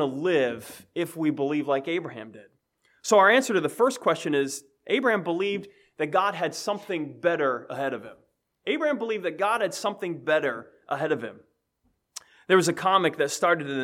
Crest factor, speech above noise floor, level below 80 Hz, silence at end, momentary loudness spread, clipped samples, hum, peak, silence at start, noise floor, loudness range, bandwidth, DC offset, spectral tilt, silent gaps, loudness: 20 dB; 47 dB; -78 dBFS; 0 s; 15 LU; under 0.1%; none; -6 dBFS; 0 s; -73 dBFS; 5 LU; 16.5 kHz; under 0.1%; -4 dB/octave; none; -25 LUFS